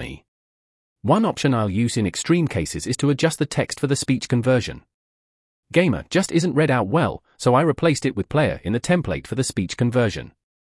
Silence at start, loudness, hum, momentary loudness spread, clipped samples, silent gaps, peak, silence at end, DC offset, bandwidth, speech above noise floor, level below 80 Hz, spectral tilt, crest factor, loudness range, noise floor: 0 s; -21 LUFS; none; 6 LU; under 0.1%; 0.28-0.96 s, 4.94-5.63 s; -4 dBFS; 0.4 s; under 0.1%; 12 kHz; over 70 dB; -48 dBFS; -5.5 dB/octave; 16 dB; 2 LU; under -90 dBFS